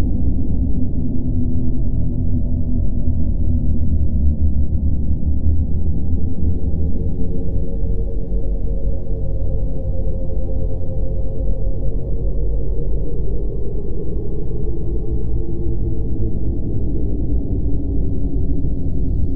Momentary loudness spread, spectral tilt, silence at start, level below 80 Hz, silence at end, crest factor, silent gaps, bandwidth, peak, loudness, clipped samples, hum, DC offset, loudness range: 5 LU; -14 dB/octave; 0 s; -20 dBFS; 0 s; 12 dB; none; 1 kHz; -2 dBFS; -23 LUFS; under 0.1%; none; under 0.1%; 4 LU